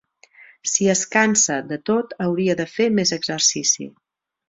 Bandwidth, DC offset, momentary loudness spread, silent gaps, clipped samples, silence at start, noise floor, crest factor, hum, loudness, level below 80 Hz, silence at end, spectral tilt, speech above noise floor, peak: 8 kHz; under 0.1%; 7 LU; none; under 0.1%; 0.4 s; -50 dBFS; 18 dB; none; -19 LUFS; -62 dBFS; 0.6 s; -2.5 dB/octave; 30 dB; -2 dBFS